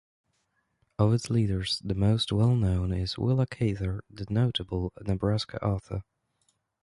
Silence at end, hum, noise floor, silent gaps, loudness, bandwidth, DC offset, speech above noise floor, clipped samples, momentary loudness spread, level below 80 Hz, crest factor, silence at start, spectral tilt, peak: 0.8 s; none; -75 dBFS; none; -28 LUFS; 11.5 kHz; under 0.1%; 48 dB; under 0.1%; 9 LU; -44 dBFS; 18 dB; 1 s; -7 dB/octave; -10 dBFS